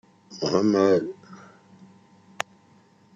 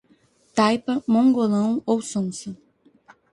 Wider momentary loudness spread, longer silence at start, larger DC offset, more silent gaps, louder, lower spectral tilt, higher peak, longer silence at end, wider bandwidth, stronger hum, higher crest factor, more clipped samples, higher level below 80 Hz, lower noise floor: first, 20 LU vs 11 LU; second, 0.3 s vs 0.55 s; neither; neither; about the same, -24 LUFS vs -22 LUFS; about the same, -5.5 dB/octave vs -5.5 dB/octave; about the same, -4 dBFS vs -6 dBFS; first, 1.8 s vs 0.8 s; second, 8.4 kHz vs 11.5 kHz; neither; first, 22 dB vs 16 dB; neither; second, -70 dBFS vs -64 dBFS; about the same, -57 dBFS vs -60 dBFS